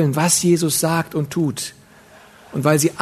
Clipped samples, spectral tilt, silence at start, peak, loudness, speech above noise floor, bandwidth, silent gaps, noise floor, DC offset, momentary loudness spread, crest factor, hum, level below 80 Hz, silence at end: under 0.1%; -4.5 dB/octave; 0 s; 0 dBFS; -18 LUFS; 28 dB; 13.5 kHz; none; -46 dBFS; under 0.1%; 12 LU; 18 dB; none; -58 dBFS; 0 s